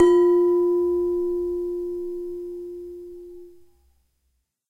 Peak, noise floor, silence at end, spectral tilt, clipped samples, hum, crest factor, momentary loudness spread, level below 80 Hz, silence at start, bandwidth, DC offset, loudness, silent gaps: -6 dBFS; -73 dBFS; 1.2 s; -6.5 dB/octave; under 0.1%; none; 18 dB; 21 LU; -54 dBFS; 0 s; 7.6 kHz; under 0.1%; -23 LUFS; none